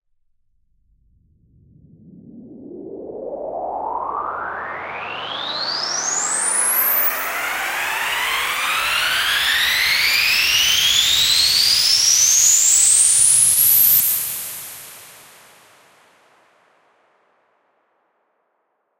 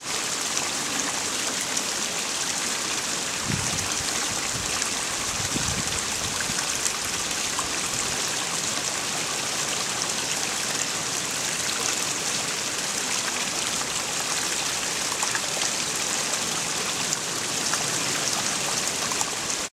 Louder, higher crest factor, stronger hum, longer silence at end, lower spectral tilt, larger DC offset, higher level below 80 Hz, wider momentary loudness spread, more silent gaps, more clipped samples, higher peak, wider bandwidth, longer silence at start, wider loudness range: first, -14 LUFS vs -24 LUFS; second, 18 dB vs 24 dB; neither; first, 3.85 s vs 0.05 s; second, 2 dB/octave vs -0.5 dB/octave; neither; about the same, -54 dBFS vs -54 dBFS; first, 17 LU vs 2 LU; neither; neither; about the same, -2 dBFS vs -2 dBFS; about the same, 16 kHz vs 16.5 kHz; first, 2.15 s vs 0 s; first, 17 LU vs 1 LU